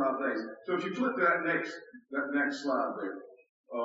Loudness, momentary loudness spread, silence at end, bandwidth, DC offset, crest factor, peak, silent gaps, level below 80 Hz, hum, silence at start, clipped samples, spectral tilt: -32 LUFS; 13 LU; 0 s; 7.6 kHz; under 0.1%; 18 dB; -14 dBFS; 3.49-3.64 s; -86 dBFS; none; 0 s; under 0.1%; -3 dB/octave